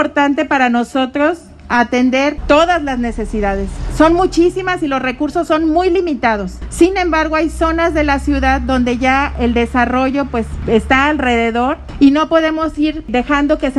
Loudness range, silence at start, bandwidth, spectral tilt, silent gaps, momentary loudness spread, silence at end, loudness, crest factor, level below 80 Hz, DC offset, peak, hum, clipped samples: 1 LU; 0 s; 12 kHz; -5.5 dB/octave; none; 7 LU; 0 s; -14 LUFS; 14 dB; -28 dBFS; under 0.1%; 0 dBFS; none; under 0.1%